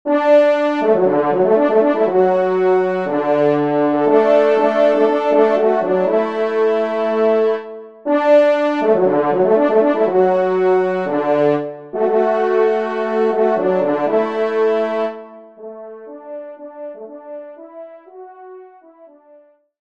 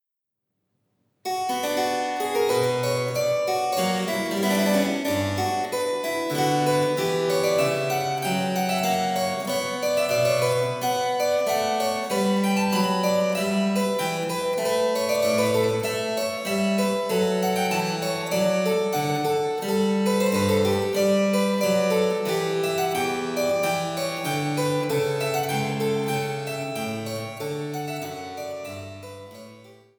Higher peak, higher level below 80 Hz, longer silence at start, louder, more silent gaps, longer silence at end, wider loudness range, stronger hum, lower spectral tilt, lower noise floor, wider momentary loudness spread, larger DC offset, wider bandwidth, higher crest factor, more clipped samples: first, -2 dBFS vs -8 dBFS; about the same, -68 dBFS vs -66 dBFS; second, 0.05 s vs 1.25 s; first, -15 LUFS vs -24 LUFS; neither; first, 1.15 s vs 0.25 s; first, 19 LU vs 4 LU; neither; first, -7.5 dB/octave vs -4.5 dB/octave; second, -49 dBFS vs -84 dBFS; first, 20 LU vs 8 LU; first, 0.3% vs under 0.1%; second, 7.4 kHz vs over 20 kHz; about the same, 14 dB vs 16 dB; neither